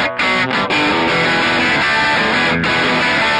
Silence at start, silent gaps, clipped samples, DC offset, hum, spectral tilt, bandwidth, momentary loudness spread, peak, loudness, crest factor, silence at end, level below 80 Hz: 0 s; none; under 0.1%; under 0.1%; none; -4 dB/octave; 11 kHz; 2 LU; -6 dBFS; -13 LUFS; 10 dB; 0 s; -44 dBFS